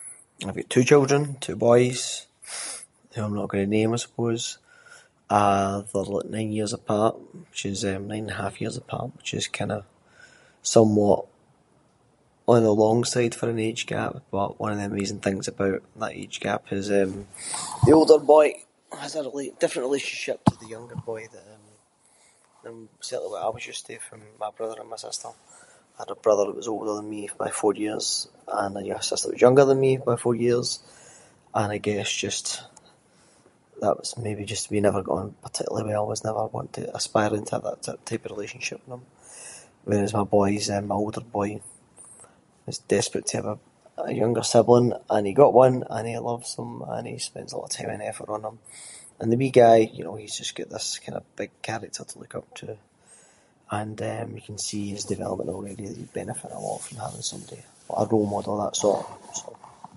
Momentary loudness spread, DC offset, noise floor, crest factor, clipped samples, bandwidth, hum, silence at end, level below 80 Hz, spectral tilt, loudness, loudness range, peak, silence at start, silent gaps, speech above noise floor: 19 LU; under 0.1%; -62 dBFS; 24 dB; under 0.1%; 11.5 kHz; none; 0.3 s; -56 dBFS; -5 dB/octave; -25 LUFS; 11 LU; -2 dBFS; 0 s; none; 38 dB